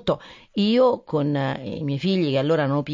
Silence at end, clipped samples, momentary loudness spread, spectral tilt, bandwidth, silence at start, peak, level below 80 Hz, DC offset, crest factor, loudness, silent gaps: 0 s; under 0.1%; 10 LU; -8 dB/octave; 7.6 kHz; 0.05 s; -8 dBFS; -58 dBFS; under 0.1%; 14 dB; -23 LUFS; none